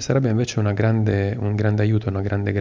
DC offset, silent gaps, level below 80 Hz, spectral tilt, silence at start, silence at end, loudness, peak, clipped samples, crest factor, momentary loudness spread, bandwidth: under 0.1%; none; -40 dBFS; -7 dB/octave; 0 s; 0 s; -21 LUFS; -6 dBFS; under 0.1%; 14 dB; 4 LU; 7.6 kHz